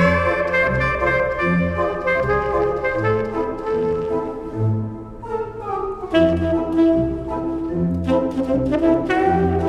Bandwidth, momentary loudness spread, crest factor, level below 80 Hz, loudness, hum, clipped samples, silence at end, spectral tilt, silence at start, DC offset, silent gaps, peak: 10 kHz; 8 LU; 16 dB; -36 dBFS; -20 LUFS; none; under 0.1%; 0 s; -8 dB/octave; 0 s; under 0.1%; none; -4 dBFS